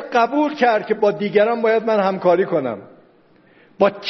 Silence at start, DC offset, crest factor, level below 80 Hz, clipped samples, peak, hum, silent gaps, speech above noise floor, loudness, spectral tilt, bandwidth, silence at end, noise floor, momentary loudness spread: 0 s; under 0.1%; 18 dB; -66 dBFS; under 0.1%; -2 dBFS; none; none; 35 dB; -18 LUFS; -4 dB/octave; 6.2 kHz; 0 s; -53 dBFS; 4 LU